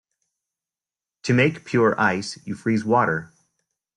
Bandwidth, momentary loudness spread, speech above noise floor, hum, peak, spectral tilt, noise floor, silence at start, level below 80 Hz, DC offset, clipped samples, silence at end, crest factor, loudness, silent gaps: 11 kHz; 10 LU; over 69 dB; none; -6 dBFS; -6 dB/octave; under -90 dBFS; 1.25 s; -62 dBFS; under 0.1%; under 0.1%; 0.7 s; 18 dB; -21 LUFS; none